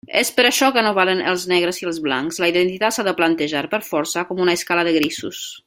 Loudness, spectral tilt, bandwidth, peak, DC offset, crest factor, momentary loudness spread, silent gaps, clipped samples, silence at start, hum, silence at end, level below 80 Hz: -18 LUFS; -3 dB/octave; 16.5 kHz; -2 dBFS; under 0.1%; 18 dB; 7 LU; none; under 0.1%; 0.1 s; none; 0.05 s; -62 dBFS